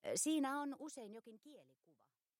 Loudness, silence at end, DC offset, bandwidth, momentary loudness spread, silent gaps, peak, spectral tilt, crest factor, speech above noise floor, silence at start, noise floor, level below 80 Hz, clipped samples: -41 LUFS; 0.75 s; under 0.1%; 16.5 kHz; 22 LU; none; -28 dBFS; -2.5 dB/octave; 18 dB; 35 dB; 0.05 s; -79 dBFS; under -90 dBFS; under 0.1%